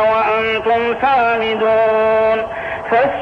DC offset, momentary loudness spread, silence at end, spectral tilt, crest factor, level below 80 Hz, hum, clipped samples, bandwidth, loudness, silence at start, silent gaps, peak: under 0.1%; 4 LU; 0 s; -6 dB/octave; 10 dB; -46 dBFS; none; under 0.1%; 6.2 kHz; -15 LUFS; 0 s; none; -4 dBFS